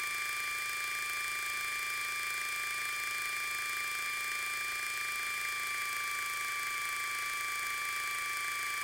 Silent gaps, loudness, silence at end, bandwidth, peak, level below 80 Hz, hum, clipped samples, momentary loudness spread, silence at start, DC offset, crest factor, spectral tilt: none; -34 LUFS; 0 s; 17 kHz; -20 dBFS; -72 dBFS; none; under 0.1%; 0 LU; 0 s; under 0.1%; 16 dB; 1.5 dB/octave